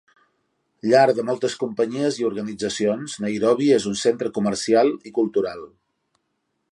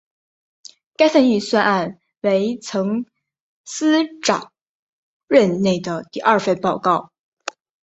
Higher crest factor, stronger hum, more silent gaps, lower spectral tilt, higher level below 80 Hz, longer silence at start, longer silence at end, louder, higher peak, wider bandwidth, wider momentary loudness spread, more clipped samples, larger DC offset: about the same, 18 dB vs 18 dB; neither; second, none vs 3.40-3.64 s, 4.61-5.28 s; about the same, -5 dB/octave vs -5 dB/octave; about the same, -64 dBFS vs -62 dBFS; second, 0.85 s vs 1 s; first, 1.05 s vs 0.8 s; about the same, -21 LUFS vs -19 LUFS; about the same, -4 dBFS vs -2 dBFS; first, 11.5 kHz vs 8.2 kHz; second, 10 LU vs 16 LU; neither; neither